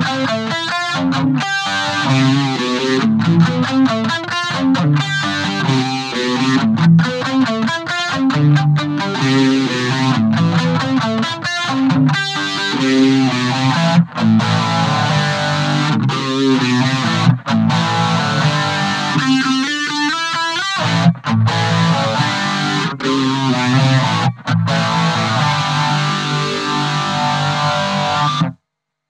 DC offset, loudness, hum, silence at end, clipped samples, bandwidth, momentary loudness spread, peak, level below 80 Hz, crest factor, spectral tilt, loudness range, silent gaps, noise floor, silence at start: under 0.1%; -15 LUFS; none; 0.55 s; under 0.1%; 10.5 kHz; 5 LU; 0 dBFS; -60 dBFS; 14 dB; -5.5 dB/octave; 1 LU; none; -76 dBFS; 0 s